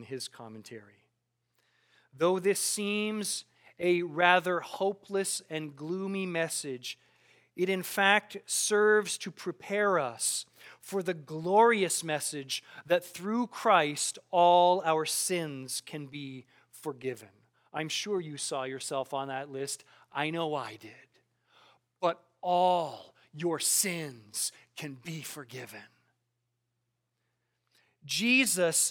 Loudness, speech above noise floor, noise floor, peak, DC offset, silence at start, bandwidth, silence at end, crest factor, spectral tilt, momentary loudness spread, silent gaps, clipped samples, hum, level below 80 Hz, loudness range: -30 LUFS; 51 dB; -82 dBFS; -8 dBFS; under 0.1%; 0 s; 19 kHz; 0 s; 24 dB; -2.5 dB/octave; 18 LU; none; under 0.1%; none; -86 dBFS; 9 LU